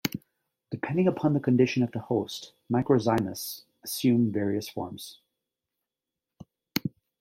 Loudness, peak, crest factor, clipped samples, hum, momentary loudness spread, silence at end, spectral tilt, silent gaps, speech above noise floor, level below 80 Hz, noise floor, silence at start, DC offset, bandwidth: -28 LUFS; -10 dBFS; 20 dB; under 0.1%; none; 16 LU; 0.3 s; -6 dB/octave; none; 62 dB; -66 dBFS; -89 dBFS; 0.05 s; under 0.1%; 16.5 kHz